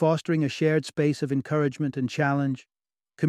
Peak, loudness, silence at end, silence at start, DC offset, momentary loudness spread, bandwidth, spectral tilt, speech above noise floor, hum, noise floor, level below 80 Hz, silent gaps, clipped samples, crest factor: -10 dBFS; -26 LUFS; 0 s; 0 s; under 0.1%; 5 LU; 11.5 kHz; -7 dB/octave; 30 dB; none; -55 dBFS; -68 dBFS; none; under 0.1%; 16 dB